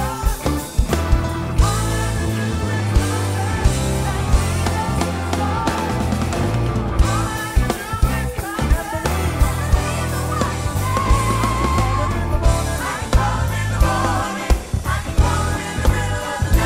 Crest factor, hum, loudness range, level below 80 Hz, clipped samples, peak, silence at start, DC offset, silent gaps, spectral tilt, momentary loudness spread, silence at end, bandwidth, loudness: 16 dB; none; 1 LU; -22 dBFS; under 0.1%; -2 dBFS; 0 s; under 0.1%; none; -5.5 dB/octave; 4 LU; 0 s; 16 kHz; -20 LUFS